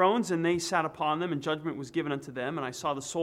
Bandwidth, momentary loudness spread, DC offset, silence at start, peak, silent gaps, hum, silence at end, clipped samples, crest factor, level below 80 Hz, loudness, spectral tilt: 15 kHz; 6 LU; under 0.1%; 0 s; -12 dBFS; none; none; 0 s; under 0.1%; 18 dB; -68 dBFS; -31 LUFS; -4.5 dB/octave